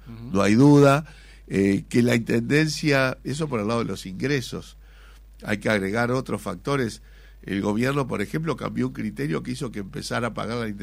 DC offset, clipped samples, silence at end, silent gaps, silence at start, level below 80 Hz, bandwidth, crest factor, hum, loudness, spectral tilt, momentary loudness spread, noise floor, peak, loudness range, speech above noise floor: under 0.1%; under 0.1%; 0 s; none; 0 s; -48 dBFS; 16 kHz; 18 dB; none; -23 LUFS; -6 dB/octave; 12 LU; -47 dBFS; -6 dBFS; 7 LU; 24 dB